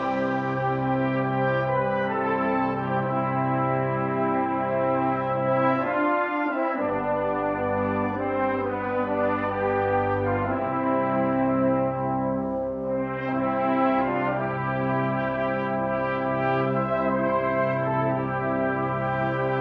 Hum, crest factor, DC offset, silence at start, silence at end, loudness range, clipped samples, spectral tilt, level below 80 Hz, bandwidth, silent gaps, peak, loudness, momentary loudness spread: none; 14 dB; under 0.1%; 0 s; 0 s; 1 LU; under 0.1%; -9.5 dB/octave; -54 dBFS; 5.6 kHz; none; -10 dBFS; -25 LUFS; 3 LU